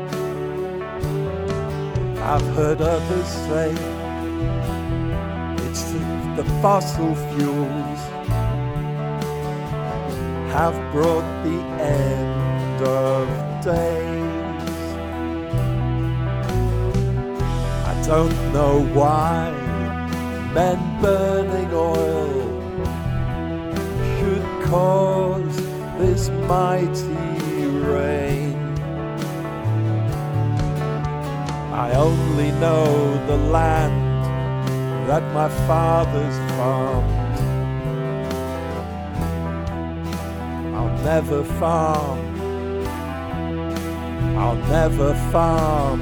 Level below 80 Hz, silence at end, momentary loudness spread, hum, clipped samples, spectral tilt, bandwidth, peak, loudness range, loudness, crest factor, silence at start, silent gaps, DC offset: -32 dBFS; 0 s; 8 LU; none; under 0.1%; -7 dB/octave; 19 kHz; -2 dBFS; 4 LU; -22 LUFS; 18 dB; 0 s; none; under 0.1%